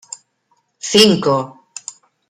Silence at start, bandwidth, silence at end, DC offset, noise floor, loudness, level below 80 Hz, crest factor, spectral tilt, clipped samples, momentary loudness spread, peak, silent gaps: 0.85 s; 15 kHz; 0.8 s; under 0.1%; -64 dBFS; -13 LUFS; -58 dBFS; 18 dB; -3.5 dB/octave; under 0.1%; 24 LU; 0 dBFS; none